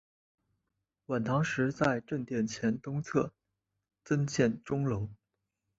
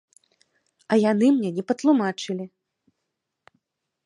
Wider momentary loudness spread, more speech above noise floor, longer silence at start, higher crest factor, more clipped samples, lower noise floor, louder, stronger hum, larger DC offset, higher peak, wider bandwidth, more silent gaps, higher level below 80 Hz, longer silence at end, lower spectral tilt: second, 7 LU vs 13 LU; second, 54 dB vs 60 dB; first, 1.1 s vs 0.9 s; about the same, 22 dB vs 18 dB; neither; first, -85 dBFS vs -81 dBFS; second, -32 LUFS vs -22 LUFS; neither; neither; second, -12 dBFS vs -8 dBFS; second, 8 kHz vs 11 kHz; neither; first, -62 dBFS vs -76 dBFS; second, 0.65 s vs 1.6 s; about the same, -6.5 dB/octave vs -6 dB/octave